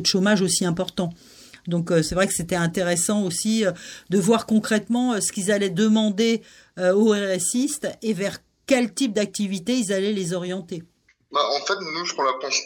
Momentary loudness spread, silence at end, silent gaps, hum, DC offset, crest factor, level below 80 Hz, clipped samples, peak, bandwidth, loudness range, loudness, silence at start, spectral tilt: 9 LU; 0 s; none; none; under 0.1%; 16 dB; -54 dBFS; under 0.1%; -6 dBFS; 19 kHz; 4 LU; -22 LUFS; 0 s; -4 dB/octave